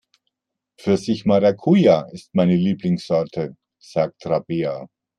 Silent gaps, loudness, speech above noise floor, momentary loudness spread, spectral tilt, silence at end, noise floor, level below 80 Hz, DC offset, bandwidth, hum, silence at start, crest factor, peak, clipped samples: none; -20 LUFS; 63 dB; 12 LU; -8 dB/octave; 0.3 s; -82 dBFS; -60 dBFS; under 0.1%; 10 kHz; none; 0.85 s; 18 dB; -4 dBFS; under 0.1%